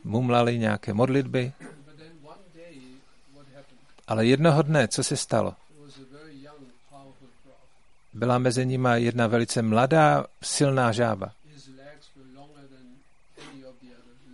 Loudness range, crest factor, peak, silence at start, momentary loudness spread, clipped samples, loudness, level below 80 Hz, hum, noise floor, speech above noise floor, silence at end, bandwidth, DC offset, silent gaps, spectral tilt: 9 LU; 20 dB; -6 dBFS; 0.05 s; 14 LU; under 0.1%; -24 LUFS; -62 dBFS; none; -62 dBFS; 39 dB; 0.65 s; 11.5 kHz; 0.2%; none; -5.5 dB/octave